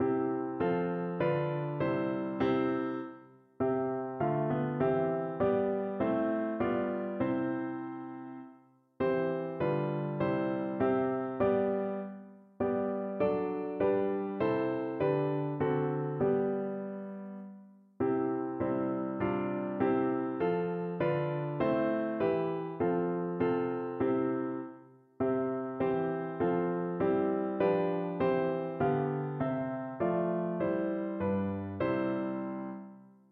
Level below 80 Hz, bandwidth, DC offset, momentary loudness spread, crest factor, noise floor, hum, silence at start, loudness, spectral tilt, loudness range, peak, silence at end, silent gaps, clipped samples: -66 dBFS; 4.5 kHz; under 0.1%; 7 LU; 16 dB; -61 dBFS; none; 0 s; -32 LUFS; -11 dB/octave; 3 LU; -16 dBFS; 0.25 s; none; under 0.1%